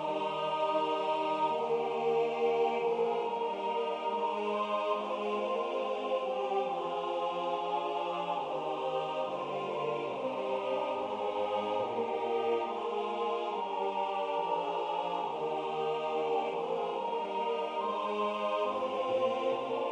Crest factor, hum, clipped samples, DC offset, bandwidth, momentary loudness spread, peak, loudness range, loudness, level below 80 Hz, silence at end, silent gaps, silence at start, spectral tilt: 14 dB; none; under 0.1%; under 0.1%; 9.6 kHz; 4 LU; -18 dBFS; 3 LU; -33 LUFS; -76 dBFS; 0 s; none; 0 s; -5 dB/octave